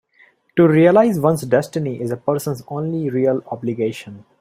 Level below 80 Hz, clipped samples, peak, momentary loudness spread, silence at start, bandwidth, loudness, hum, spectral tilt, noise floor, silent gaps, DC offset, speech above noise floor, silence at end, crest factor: -58 dBFS; under 0.1%; -2 dBFS; 13 LU; 0.55 s; 16 kHz; -18 LUFS; none; -7.5 dB/octave; -55 dBFS; none; under 0.1%; 37 dB; 0.2 s; 16 dB